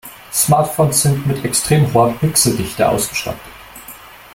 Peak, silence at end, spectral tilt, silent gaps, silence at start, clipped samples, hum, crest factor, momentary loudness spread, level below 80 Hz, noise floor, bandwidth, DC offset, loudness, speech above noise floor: 0 dBFS; 0.15 s; -4.5 dB/octave; none; 0.05 s; under 0.1%; none; 16 dB; 21 LU; -44 dBFS; -37 dBFS; 17 kHz; under 0.1%; -15 LUFS; 22 dB